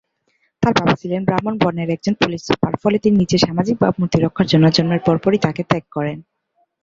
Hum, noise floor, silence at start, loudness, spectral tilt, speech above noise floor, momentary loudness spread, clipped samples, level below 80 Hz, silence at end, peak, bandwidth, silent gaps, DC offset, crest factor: none; -65 dBFS; 0.6 s; -17 LUFS; -6.5 dB/octave; 49 dB; 7 LU; under 0.1%; -46 dBFS; 0.6 s; -2 dBFS; 7.6 kHz; none; under 0.1%; 16 dB